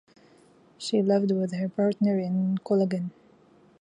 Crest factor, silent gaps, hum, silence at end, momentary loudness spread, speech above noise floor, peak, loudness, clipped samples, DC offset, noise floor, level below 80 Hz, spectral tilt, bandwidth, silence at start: 14 dB; none; none; 0.7 s; 7 LU; 33 dB; -12 dBFS; -26 LUFS; under 0.1%; under 0.1%; -58 dBFS; -74 dBFS; -7.5 dB/octave; 10.5 kHz; 0.8 s